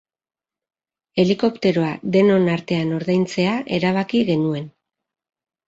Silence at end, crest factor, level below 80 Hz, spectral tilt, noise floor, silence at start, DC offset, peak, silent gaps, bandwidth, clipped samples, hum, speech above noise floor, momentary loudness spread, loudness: 1 s; 16 dB; -58 dBFS; -7 dB/octave; under -90 dBFS; 1.15 s; under 0.1%; -4 dBFS; none; 7.8 kHz; under 0.1%; none; over 71 dB; 7 LU; -20 LUFS